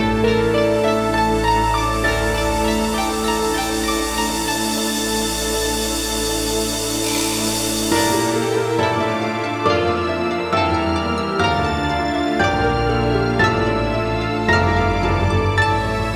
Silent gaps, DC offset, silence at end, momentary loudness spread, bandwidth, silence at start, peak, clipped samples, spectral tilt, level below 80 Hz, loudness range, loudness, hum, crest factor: none; under 0.1%; 0 s; 3 LU; over 20 kHz; 0 s; -2 dBFS; under 0.1%; -4 dB/octave; -32 dBFS; 2 LU; -18 LUFS; none; 16 dB